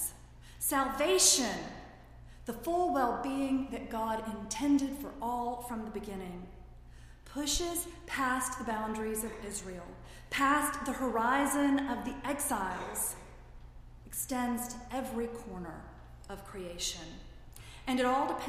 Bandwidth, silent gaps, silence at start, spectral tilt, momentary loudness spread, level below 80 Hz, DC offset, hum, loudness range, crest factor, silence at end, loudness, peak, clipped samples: 15.5 kHz; none; 0 s; -2.5 dB/octave; 18 LU; -52 dBFS; under 0.1%; none; 8 LU; 22 dB; 0 s; -33 LUFS; -12 dBFS; under 0.1%